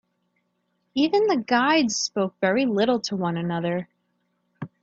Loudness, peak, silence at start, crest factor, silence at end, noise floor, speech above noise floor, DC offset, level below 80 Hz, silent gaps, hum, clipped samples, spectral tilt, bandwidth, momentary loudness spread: -23 LUFS; -6 dBFS; 0.95 s; 18 dB; 0.15 s; -73 dBFS; 51 dB; under 0.1%; -68 dBFS; none; 60 Hz at -45 dBFS; under 0.1%; -4.5 dB/octave; 8 kHz; 10 LU